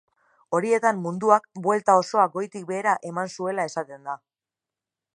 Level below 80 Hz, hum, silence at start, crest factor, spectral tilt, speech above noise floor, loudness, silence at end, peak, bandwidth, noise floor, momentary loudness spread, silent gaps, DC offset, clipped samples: -78 dBFS; none; 0.5 s; 22 dB; -5 dB/octave; 66 dB; -24 LUFS; 1 s; -4 dBFS; 11.5 kHz; -90 dBFS; 13 LU; none; under 0.1%; under 0.1%